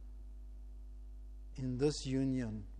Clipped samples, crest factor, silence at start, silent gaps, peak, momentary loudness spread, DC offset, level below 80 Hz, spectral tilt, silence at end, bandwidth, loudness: under 0.1%; 18 dB; 0 s; none; -20 dBFS; 18 LU; under 0.1%; -50 dBFS; -6.5 dB/octave; 0 s; 10 kHz; -37 LUFS